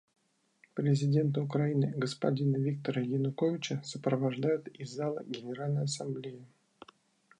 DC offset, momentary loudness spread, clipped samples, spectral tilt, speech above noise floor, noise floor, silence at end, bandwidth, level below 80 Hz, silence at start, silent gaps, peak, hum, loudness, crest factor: under 0.1%; 10 LU; under 0.1%; -7 dB/octave; 36 dB; -68 dBFS; 0.95 s; 10 kHz; -78 dBFS; 0.75 s; none; -14 dBFS; none; -33 LUFS; 18 dB